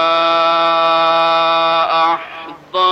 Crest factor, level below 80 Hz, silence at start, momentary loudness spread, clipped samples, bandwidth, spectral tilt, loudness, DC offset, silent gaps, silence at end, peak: 10 dB; -62 dBFS; 0 s; 10 LU; under 0.1%; 8.2 kHz; -3.5 dB/octave; -13 LUFS; under 0.1%; none; 0 s; -4 dBFS